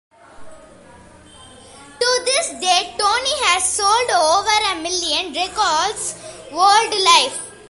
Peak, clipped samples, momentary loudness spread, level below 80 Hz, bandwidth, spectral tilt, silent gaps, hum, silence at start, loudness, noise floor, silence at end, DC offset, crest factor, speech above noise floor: 0 dBFS; under 0.1%; 9 LU; -52 dBFS; 11.5 kHz; 0.5 dB/octave; none; none; 0.4 s; -16 LUFS; -44 dBFS; 0.15 s; under 0.1%; 20 dB; 27 dB